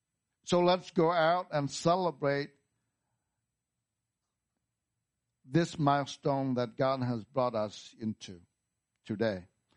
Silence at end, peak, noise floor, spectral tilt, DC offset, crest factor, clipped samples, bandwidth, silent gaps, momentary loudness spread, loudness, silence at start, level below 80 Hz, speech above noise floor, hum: 0.3 s; -12 dBFS; -87 dBFS; -6 dB/octave; under 0.1%; 20 dB; under 0.1%; 10 kHz; none; 13 LU; -31 LUFS; 0.45 s; -72 dBFS; 57 dB; none